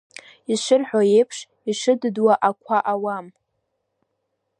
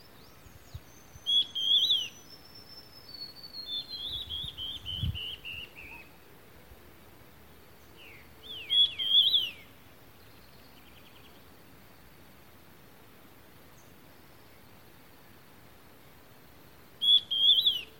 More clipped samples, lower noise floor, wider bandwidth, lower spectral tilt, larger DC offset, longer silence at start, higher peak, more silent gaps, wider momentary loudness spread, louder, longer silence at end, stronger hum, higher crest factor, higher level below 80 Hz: neither; first, -75 dBFS vs -56 dBFS; second, 10.5 kHz vs 17 kHz; first, -4.5 dB/octave vs -2 dB/octave; second, under 0.1% vs 0.1%; second, 0.5 s vs 0.75 s; first, -4 dBFS vs -12 dBFS; neither; second, 11 LU vs 28 LU; first, -20 LUFS vs -26 LUFS; first, 1.3 s vs 0.15 s; neither; about the same, 18 dB vs 22 dB; second, -78 dBFS vs -58 dBFS